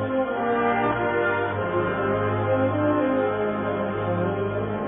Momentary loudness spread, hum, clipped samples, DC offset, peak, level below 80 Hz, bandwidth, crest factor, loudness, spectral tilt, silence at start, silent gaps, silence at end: 4 LU; none; under 0.1%; under 0.1%; -10 dBFS; -52 dBFS; 3.8 kHz; 14 dB; -24 LUFS; -11.5 dB/octave; 0 s; none; 0 s